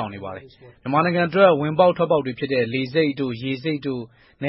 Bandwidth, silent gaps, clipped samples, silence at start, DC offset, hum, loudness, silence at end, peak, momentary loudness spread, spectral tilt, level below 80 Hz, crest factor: 5.8 kHz; none; under 0.1%; 0 s; under 0.1%; none; -21 LUFS; 0 s; -2 dBFS; 18 LU; -11 dB/octave; -60 dBFS; 18 dB